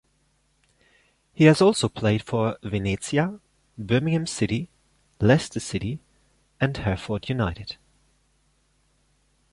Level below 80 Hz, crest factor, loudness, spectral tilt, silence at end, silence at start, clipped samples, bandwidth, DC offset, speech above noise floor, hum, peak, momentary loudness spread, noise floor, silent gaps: -48 dBFS; 22 dB; -24 LUFS; -6 dB/octave; 1.8 s; 1.4 s; under 0.1%; 11.5 kHz; under 0.1%; 44 dB; none; -4 dBFS; 19 LU; -67 dBFS; none